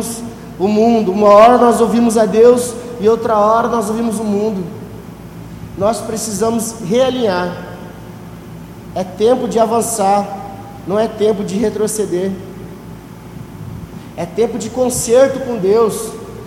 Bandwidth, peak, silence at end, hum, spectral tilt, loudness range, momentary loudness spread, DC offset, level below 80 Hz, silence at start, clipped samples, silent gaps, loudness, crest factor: 16.5 kHz; 0 dBFS; 0 s; none; -5 dB/octave; 8 LU; 22 LU; under 0.1%; -44 dBFS; 0 s; under 0.1%; none; -14 LUFS; 14 dB